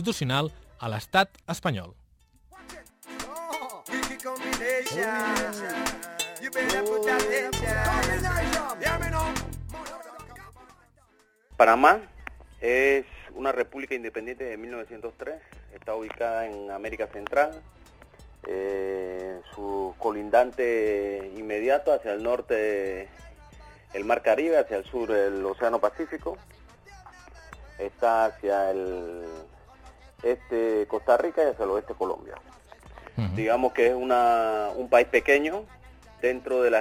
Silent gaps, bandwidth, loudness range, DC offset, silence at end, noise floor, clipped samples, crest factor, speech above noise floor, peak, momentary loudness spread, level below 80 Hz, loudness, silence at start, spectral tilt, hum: none; 19 kHz; 8 LU; under 0.1%; 0 s; -63 dBFS; under 0.1%; 24 dB; 37 dB; -4 dBFS; 17 LU; -46 dBFS; -26 LUFS; 0 s; -4.5 dB/octave; none